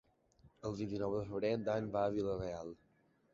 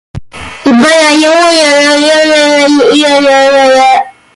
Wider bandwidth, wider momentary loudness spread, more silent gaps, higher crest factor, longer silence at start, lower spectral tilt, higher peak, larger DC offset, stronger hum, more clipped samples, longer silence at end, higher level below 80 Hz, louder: second, 7.6 kHz vs 11.5 kHz; first, 11 LU vs 7 LU; neither; first, 18 dB vs 6 dB; first, 0.45 s vs 0.15 s; first, -6.5 dB/octave vs -2.5 dB/octave; second, -22 dBFS vs 0 dBFS; neither; neither; neither; first, 0.6 s vs 0.25 s; second, -64 dBFS vs -42 dBFS; second, -39 LUFS vs -5 LUFS